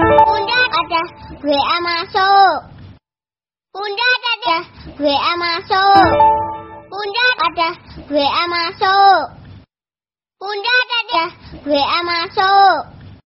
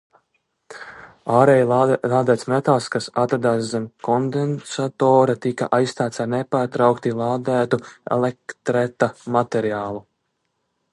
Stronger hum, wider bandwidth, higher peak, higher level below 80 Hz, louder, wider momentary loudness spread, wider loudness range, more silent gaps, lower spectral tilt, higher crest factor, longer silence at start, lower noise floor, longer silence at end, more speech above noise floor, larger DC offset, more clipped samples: neither; second, 6 kHz vs 11.5 kHz; about the same, 0 dBFS vs -2 dBFS; first, -44 dBFS vs -62 dBFS; first, -14 LUFS vs -20 LUFS; first, 15 LU vs 11 LU; about the same, 3 LU vs 4 LU; neither; second, -0.5 dB/octave vs -6.5 dB/octave; about the same, 16 dB vs 18 dB; second, 0 s vs 0.7 s; first, under -90 dBFS vs -73 dBFS; second, 0.15 s vs 0.95 s; first, over 75 dB vs 53 dB; neither; neither